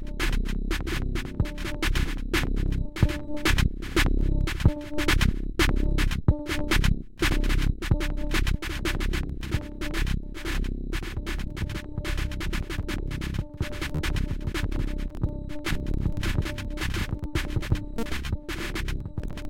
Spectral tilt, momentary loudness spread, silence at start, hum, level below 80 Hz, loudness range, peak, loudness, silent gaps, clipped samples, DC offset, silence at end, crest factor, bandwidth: -5 dB/octave; 8 LU; 0 s; none; -28 dBFS; 6 LU; -6 dBFS; -29 LUFS; none; under 0.1%; under 0.1%; 0 s; 20 dB; 16.5 kHz